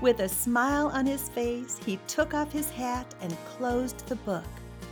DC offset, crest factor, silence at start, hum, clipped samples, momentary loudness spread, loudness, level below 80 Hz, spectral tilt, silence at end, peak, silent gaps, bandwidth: under 0.1%; 18 dB; 0 s; none; under 0.1%; 11 LU; -30 LUFS; -48 dBFS; -4 dB/octave; 0 s; -12 dBFS; none; over 20 kHz